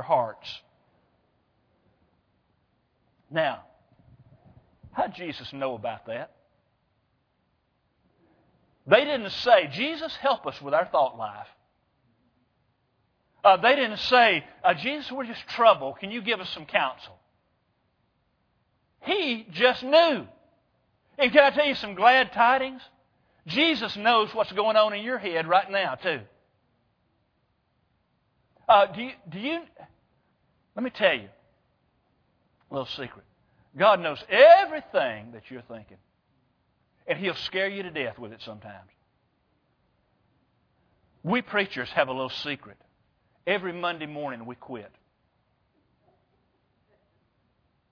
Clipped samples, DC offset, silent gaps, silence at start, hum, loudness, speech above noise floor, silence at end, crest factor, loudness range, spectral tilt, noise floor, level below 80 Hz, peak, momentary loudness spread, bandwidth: under 0.1%; under 0.1%; none; 0 s; none; -24 LUFS; 47 dB; 3.05 s; 26 dB; 14 LU; -5.5 dB/octave; -72 dBFS; -68 dBFS; -2 dBFS; 21 LU; 5.4 kHz